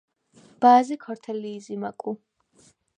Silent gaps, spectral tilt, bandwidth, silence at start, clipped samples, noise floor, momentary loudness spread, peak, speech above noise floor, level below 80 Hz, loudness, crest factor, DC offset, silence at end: none; -5.5 dB/octave; 9.6 kHz; 0.6 s; under 0.1%; -60 dBFS; 17 LU; -4 dBFS; 38 dB; -80 dBFS; -24 LUFS; 20 dB; under 0.1%; 0.85 s